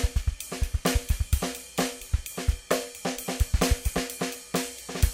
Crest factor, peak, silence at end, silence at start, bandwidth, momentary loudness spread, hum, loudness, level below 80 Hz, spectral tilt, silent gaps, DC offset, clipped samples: 20 dB; -8 dBFS; 0 s; 0 s; 17 kHz; 7 LU; none; -29 LUFS; -30 dBFS; -4 dB/octave; none; under 0.1%; under 0.1%